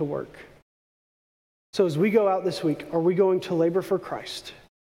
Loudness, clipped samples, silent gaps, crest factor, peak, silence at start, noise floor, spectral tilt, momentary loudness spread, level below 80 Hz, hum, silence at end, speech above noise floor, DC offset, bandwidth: -24 LUFS; under 0.1%; 0.62-1.73 s; 16 dB; -10 dBFS; 0 s; under -90 dBFS; -6.5 dB/octave; 14 LU; -64 dBFS; none; 0.4 s; over 66 dB; under 0.1%; 15.5 kHz